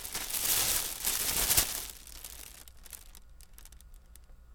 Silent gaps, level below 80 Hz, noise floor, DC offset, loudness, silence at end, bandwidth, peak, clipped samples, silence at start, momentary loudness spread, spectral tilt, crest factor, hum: none; -50 dBFS; -53 dBFS; under 0.1%; -28 LUFS; 0 s; over 20 kHz; -10 dBFS; under 0.1%; 0 s; 23 LU; 0 dB/octave; 24 dB; none